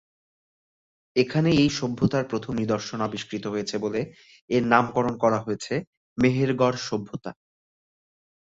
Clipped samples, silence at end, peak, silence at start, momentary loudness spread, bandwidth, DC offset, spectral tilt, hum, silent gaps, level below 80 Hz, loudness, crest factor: under 0.1%; 1.15 s; -4 dBFS; 1.15 s; 11 LU; 8 kHz; under 0.1%; -6 dB/octave; none; 4.41-4.48 s, 5.87-6.16 s; -56 dBFS; -25 LUFS; 22 dB